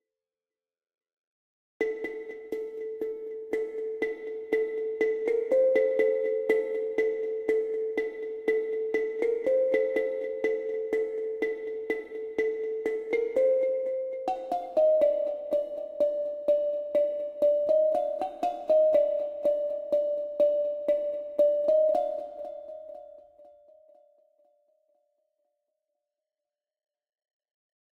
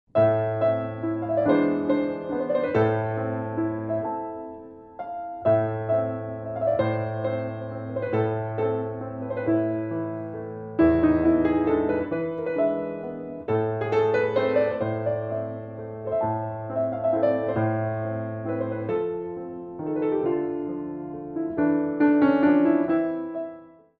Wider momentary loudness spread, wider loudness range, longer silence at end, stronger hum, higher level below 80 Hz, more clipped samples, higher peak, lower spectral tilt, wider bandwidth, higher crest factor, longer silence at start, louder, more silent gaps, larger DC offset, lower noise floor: about the same, 11 LU vs 13 LU; first, 8 LU vs 4 LU; first, 4.45 s vs 0.3 s; neither; second, -70 dBFS vs -54 dBFS; neither; second, -12 dBFS vs -8 dBFS; second, -5 dB/octave vs -10 dB/octave; first, 6.6 kHz vs 4.9 kHz; about the same, 16 dB vs 16 dB; first, 1.8 s vs 0.15 s; second, -28 LUFS vs -25 LUFS; neither; neither; first, under -90 dBFS vs -45 dBFS